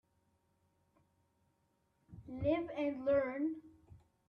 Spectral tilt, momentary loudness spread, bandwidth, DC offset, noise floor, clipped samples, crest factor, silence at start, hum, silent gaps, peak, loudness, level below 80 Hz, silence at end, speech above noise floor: -9 dB/octave; 17 LU; 5.6 kHz; under 0.1%; -78 dBFS; under 0.1%; 18 dB; 2.1 s; none; none; -22 dBFS; -37 LUFS; -66 dBFS; 0.3 s; 43 dB